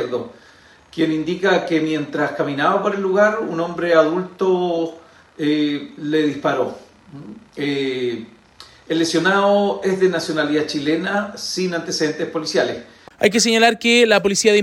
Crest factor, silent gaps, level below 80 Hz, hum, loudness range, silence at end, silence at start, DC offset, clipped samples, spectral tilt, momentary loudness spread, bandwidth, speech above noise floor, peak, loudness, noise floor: 18 dB; none; -62 dBFS; none; 5 LU; 0 s; 0 s; under 0.1%; under 0.1%; -4 dB/octave; 11 LU; 16.5 kHz; 27 dB; 0 dBFS; -19 LUFS; -46 dBFS